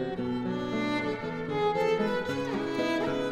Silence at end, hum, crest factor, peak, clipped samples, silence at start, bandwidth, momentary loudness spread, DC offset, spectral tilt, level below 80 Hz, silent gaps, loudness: 0 s; none; 14 dB; -16 dBFS; under 0.1%; 0 s; 13 kHz; 5 LU; under 0.1%; -6 dB/octave; -58 dBFS; none; -30 LUFS